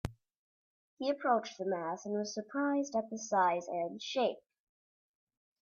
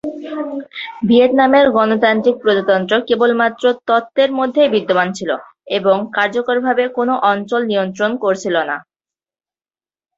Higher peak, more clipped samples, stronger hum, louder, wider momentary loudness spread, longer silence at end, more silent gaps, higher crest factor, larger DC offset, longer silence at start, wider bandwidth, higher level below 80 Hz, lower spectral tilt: second, -16 dBFS vs -2 dBFS; neither; neither; second, -35 LUFS vs -15 LUFS; second, 7 LU vs 12 LU; about the same, 1.25 s vs 1.35 s; first, 0.37-0.97 s vs none; first, 20 dB vs 14 dB; neither; about the same, 0.05 s vs 0.05 s; first, 11.5 kHz vs 7.8 kHz; about the same, -64 dBFS vs -60 dBFS; about the same, -4.5 dB/octave vs -5.5 dB/octave